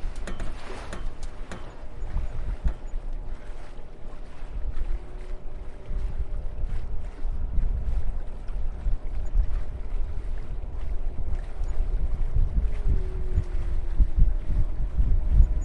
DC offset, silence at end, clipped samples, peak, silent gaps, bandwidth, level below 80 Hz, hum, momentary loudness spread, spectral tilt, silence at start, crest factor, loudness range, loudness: under 0.1%; 0 s; under 0.1%; -4 dBFS; none; 4.5 kHz; -26 dBFS; none; 14 LU; -7.5 dB/octave; 0 s; 20 dB; 8 LU; -33 LUFS